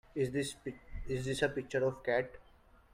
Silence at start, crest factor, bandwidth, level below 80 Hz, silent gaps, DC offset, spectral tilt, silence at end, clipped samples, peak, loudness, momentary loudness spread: 0.15 s; 20 dB; 15.5 kHz; -54 dBFS; none; under 0.1%; -5 dB/octave; 0.5 s; under 0.1%; -16 dBFS; -36 LUFS; 12 LU